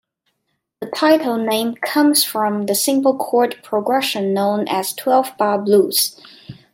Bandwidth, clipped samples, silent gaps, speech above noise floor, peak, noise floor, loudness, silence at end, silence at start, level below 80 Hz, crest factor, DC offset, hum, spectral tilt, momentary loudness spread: 16.5 kHz; under 0.1%; none; 55 dB; -2 dBFS; -72 dBFS; -17 LUFS; 0.2 s; 0.8 s; -68 dBFS; 16 dB; under 0.1%; none; -3.5 dB/octave; 6 LU